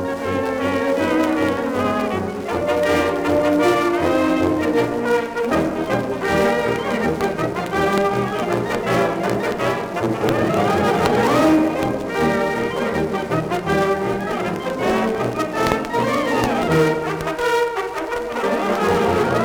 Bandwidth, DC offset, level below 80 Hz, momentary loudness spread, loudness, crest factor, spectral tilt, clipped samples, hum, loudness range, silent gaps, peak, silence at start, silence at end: over 20 kHz; under 0.1%; -46 dBFS; 5 LU; -19 LUFS; 18 dB; -6 dB/octave; under 0.1%; none; 2 LU; none; 0 dBFS; 0 s; 0 s